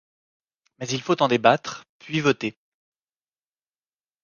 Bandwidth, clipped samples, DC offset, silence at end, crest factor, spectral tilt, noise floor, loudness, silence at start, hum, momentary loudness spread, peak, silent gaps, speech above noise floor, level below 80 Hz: 10 kHz; under 0.1%; under 0.1%; 1.7 s; 24 dB; -5 dB/octave; under -90 dBFS; -22 LUFS; 0.8 s; none; 17 LU; -2 dBFS; 1.89-2.00 s; over 67 dB; -68 dBFS